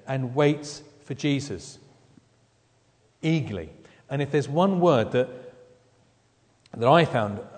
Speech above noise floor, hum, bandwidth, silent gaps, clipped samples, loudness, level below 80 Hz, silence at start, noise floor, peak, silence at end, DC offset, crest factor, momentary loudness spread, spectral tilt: 40 dB; none; 9.4 kHz; none; under 0.1%; -24 LUFS; -62 dBFS; 0.05 s; -64 dBFS; -4 dBFS; 0 s; under 0.1%; 24 dB; 19 LU; -6.5 dB/octave